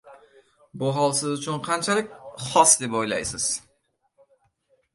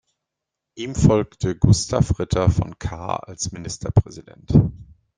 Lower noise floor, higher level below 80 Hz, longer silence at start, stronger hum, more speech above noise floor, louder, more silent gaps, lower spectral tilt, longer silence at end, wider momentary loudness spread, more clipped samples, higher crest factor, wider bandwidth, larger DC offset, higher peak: second, -70 dBFS vs -83 dBFS; second, -60 dBFS vs -36 dBFS; second, 0.05 s vs 0.75 s; neither; second, 47 dB vs 64 dB; about the same, -22 LUFS vs -21 LUFS; neither; second, -2.5 dB/octave vs -6.5 dB/octave; first, 1.35 s vs 0.35 s; about the same, 13 LU vs 12 LU; neither; first, 24 dB vs 18 dB; first, 12 kHz vs 9.8 kHz; neither; about the same, -2 dBFS vs -2 dBFS